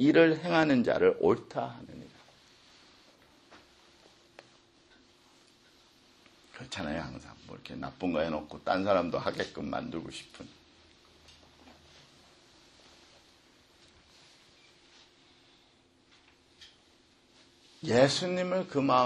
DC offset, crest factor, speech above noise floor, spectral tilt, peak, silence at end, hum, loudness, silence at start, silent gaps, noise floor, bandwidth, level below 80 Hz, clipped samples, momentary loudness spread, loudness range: under 0.1%; 24 dB; 36 dB; -5.5 dB/octave; -10 dBFS; 0 s; none; -30 LUFS; 0 s; none; -65 dBFS; 11.5 kHz; -64 dBFS; under 0.1%; 24 LU; 25 LU